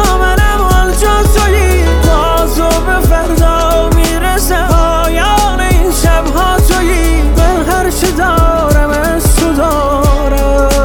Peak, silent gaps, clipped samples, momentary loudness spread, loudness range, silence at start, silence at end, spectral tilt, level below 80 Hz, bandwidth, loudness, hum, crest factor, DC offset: 0 dBFS; none; under 0.1%; 2 LU; 1 LU; 0 s; 0 s; -5 dB/octave; -12 dBFS; 18.5 kHz; -10 LUFS; none; 8 dB; under 0.1%